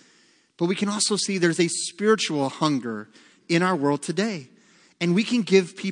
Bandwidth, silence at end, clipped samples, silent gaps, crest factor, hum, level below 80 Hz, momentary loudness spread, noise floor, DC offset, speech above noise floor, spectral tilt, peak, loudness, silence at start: 10.5 kHz; 0 s; under 0.1%; none; 20 dB; none; -76 dBFS; 8 LU; -60 dBFS; under 0.1%; 37 dB; -4.5 dB/octave; -4 dBFS; -23 LUFS; 0.6 s